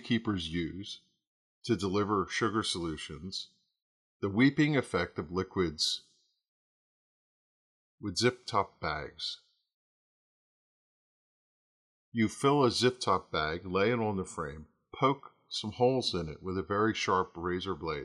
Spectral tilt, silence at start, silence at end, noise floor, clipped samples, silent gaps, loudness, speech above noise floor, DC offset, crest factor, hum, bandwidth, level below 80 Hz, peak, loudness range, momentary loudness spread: -5 dB/octave; 0 s; 0 s; under -90 dBFS; under 0.1%; 1.27-1.62 s, 3.82-4.20 s, 6.48-7.98 s, 9.74-12.12 s; -32 LUFS; over 59 dB; under 0.1%; 20 dB; none; 13 kHz; -62 dBFS; -12 dBFS; 6 LU; 13 LU